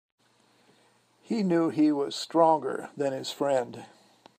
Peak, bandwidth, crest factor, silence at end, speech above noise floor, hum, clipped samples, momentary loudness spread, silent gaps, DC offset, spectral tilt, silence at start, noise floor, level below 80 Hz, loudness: -8 dBFS; 15.5 kHz; 20 dB; 0.55 s; 38 dB; none; under 0.1%; 11 LU; none; under 0.1%; -6 dB/octave; 1.3 s; -65 dBFS; -80 dBFS; -27 LUFS